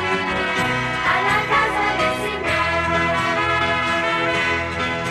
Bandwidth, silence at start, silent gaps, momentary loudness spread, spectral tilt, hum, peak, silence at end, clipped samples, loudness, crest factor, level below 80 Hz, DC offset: 14.5 kHz; 0 s; none; 3 LU; -4 dB/octave; none; -8 dBFS; 0 s; under 0.1%; -19 LUFS; 12 dB; -42 dBFS; under 0.1%